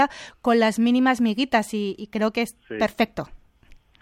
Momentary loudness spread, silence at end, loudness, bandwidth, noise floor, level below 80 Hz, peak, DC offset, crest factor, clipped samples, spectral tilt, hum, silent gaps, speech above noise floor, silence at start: 9 LU; 0.65 s; -23 LUFS; 15 kHz; -52 dBFS; -54 dBFS; -6 dBFS; under 0.1%; 18 dB; under 0.1%; -5 dB/octave; none; none; 29 dB; 0 s